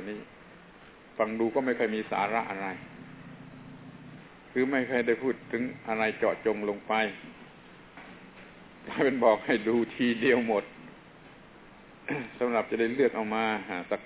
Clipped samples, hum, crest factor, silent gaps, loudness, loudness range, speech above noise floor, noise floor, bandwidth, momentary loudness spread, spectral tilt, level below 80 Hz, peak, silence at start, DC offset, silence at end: under 0.1%; none; 22 dB; none; -29 LUFS; 4 LU; 24 dB; -52 dBFS; 4 kHz; 23 LU; -9 dB/octave; -66 dBFS; -8 dBFS; 0 s; under 0.1%; 0 s